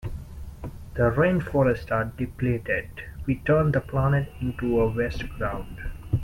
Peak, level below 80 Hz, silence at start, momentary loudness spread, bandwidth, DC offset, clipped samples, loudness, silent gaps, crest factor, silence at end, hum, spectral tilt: -8 dBFS; -38 dBFS; 0 s; 17 LU; 16 kHz; under 0.1%; under 0.1%; -25 LUFS; none; 16 dB; 0 s; none; -8.5 dB/octave